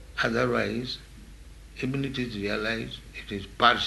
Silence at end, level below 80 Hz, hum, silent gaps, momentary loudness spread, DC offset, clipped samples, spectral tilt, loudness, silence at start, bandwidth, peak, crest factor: 0 s; -48 dBFS; none; none; 20 LU; under 0.1%; under 0.1%; -5 dB/octave; -29 LUFS; 0 s; 12 kHz; -4 dBFS; 24 dB